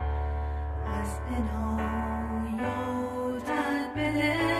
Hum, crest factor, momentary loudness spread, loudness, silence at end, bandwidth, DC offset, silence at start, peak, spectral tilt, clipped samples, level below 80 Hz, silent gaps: none; 16 dB; 6 LU; -31 LUFS; 0 s; 14 kHz; under 0.1%; 0 s; -14 dBFS; -6.5 dB/octave; under 0.1%; -36 dBFS; none